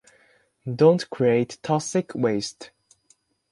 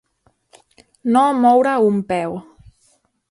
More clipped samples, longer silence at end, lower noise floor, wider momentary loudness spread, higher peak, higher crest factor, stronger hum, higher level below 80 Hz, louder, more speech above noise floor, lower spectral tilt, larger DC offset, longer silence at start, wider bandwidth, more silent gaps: neither; about the same, 0.85 s vs 0.9 s; about the same, -64 dBFS vs -62 dBFS; about the same, 16 LU vs 14 LU; about the same, -4 dBFS vs -2 dBFS; about the same, 20 dB vs 16 dB; neither; second, -66 dBFS vs -58 dBFS; second, -23 LUFS vs -16 LUFS; second, 41 dB vs 47 dB; about the same, -6 dB/octave vs -6.5 dB/octave; neither; second, 0.65 s vs 1.05 s; about the same, 11.5 kHz vs 11.5 kHz; neither